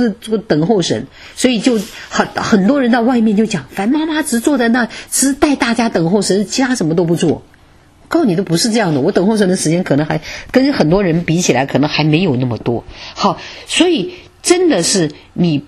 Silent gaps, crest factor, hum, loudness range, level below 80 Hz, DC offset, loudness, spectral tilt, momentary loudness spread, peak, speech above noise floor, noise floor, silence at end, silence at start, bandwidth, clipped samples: none; 14 dB; none; 1 LU; -42 dBFS; under 0.1%; -14 LUFS; -4.5 dB/octave; 7 LU; 0 dBFS; 32 dB; -45 dBFS; 0 s; 0 s; 13.5 kHz; under 0.1%